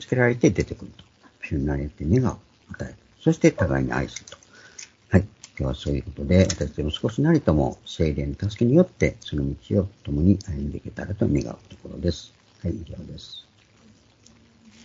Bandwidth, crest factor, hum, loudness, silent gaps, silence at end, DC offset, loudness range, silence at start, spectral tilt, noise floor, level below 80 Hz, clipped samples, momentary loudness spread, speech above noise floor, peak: 7.8 kHz; 22 dB; none; -24 LUFS; none; 1.45 s; under 0.1%; 7 LU; 0 s; -6.5 dB/octave; -55 dBFS; -38 dBFS; under 0.1%; 19 LU; 32 dB; -2 dBFS